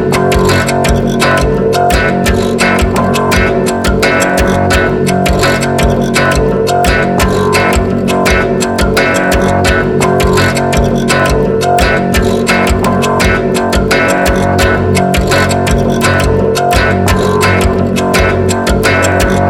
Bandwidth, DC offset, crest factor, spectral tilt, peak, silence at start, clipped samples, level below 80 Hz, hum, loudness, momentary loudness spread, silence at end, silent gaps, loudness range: 18.5 kHz; under 0.1%; 10 dB; -5 dB/octave; 0 dBFS; 0 s; under 0.1%; -20 dBFS; none; -10 LUFS; 2 LU; 0 s; none; 0 LU